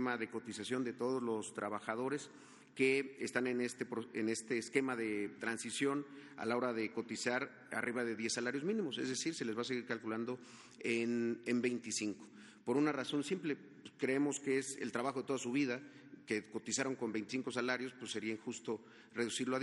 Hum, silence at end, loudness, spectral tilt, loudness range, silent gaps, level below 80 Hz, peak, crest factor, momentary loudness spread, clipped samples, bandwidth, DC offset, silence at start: none; 0 s; -39 LUFS; -4 dB/octave; 2 LU; none; -86 dBFS; -18 dBFS; 22 dB; 8 LU; under 0.1%; 11.5 kHz; under 0.1%; 0 s